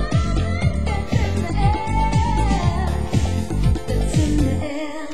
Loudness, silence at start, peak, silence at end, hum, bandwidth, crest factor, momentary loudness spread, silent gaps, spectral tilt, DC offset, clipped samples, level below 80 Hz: -21 LUFS; 0 s; -6 dBFS; 0 s; none; 12.5 kHz; 14 dB; 4 LU; none; -6.5 dB/octave; 3%; under 0.1%; -24 dBFS